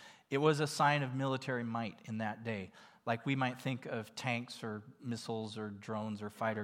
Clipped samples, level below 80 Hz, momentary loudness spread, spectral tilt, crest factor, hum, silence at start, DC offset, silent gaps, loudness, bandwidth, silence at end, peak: under 0.1%; -86 dBFS; 13 LU; -5.5 dB/octave; 22 dB; none; 0 s; under 0.1%; none; -37 LUFS; 16.5 kHz; 0 s; -14 dBFS